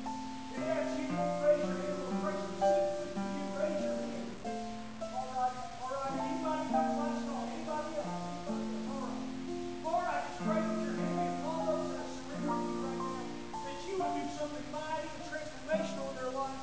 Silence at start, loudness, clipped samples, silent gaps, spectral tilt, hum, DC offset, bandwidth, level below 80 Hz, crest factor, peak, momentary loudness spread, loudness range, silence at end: 0 s; -36 LUFS; under 0.1%; none; -5.5 dB/octave; none; 0.4%; 8 kHz; -60 dBFS; 18 dB; -18 dBFS; 9 LU; 4 LU; 0 s